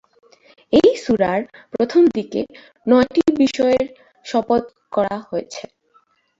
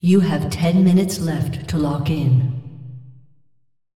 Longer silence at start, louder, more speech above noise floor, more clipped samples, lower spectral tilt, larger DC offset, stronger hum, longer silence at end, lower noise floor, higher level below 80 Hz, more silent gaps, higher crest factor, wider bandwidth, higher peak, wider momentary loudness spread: first, 0.7 s vs 0.05 s; about the same, -18 LUFS vs -19 LUFS; second, 41 dB vs 46 dB; neither; second, -5.5 dB/octave vs -7 dB/octave; neither; neither; about the same, 0.75 s vs 0.75 s; second, -59 dBFS vs -63 dBFS; second, -54 dBFS vs -48 dBFS; neither; about the same, 18 dB vs 14 dB; second, 7.8 kHz vs 14.5 kHz; about the same, -2 dBFS vs -4 dBFS; second, 14 LU vs 17 LU